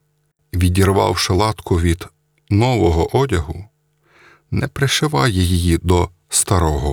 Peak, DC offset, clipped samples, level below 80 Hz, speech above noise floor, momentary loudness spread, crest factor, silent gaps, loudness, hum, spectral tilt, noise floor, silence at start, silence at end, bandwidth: -2 dBFS; under 0.1%; under 0.1%; -34 dBFS; 48 dB; 9 LU; 16 dB; none; -17 LUFS; none; -5 dB/octave; -64 dBFS; 0.55 s; 0 s; 20 kHz